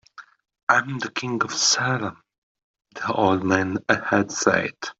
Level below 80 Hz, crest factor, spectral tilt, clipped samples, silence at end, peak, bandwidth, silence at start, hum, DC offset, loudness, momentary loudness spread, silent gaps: -66 dBFS; 22 dB; -3 dB/octave; under 0.1%; 0.1 s; -2 dBFS; 8.2 kHz; 0.2 s; none; under 0.1%; -22 LUFS; 9 LU; 0.63-0.67 s, 2.38-2.55 s, 2.64-2.74 s